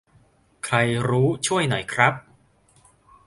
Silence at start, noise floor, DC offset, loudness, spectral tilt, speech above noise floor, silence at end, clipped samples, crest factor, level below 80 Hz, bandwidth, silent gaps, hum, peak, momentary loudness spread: 0.65 s; -59 dBFS; under 0.1%; -21 LUFS; -4.5 dB/octave; 38 dB; 1.05 s; under 0.1%; 24 dB; -56 dBFS; 11.5 kHz; none; none; 0 dBFS; 6 LU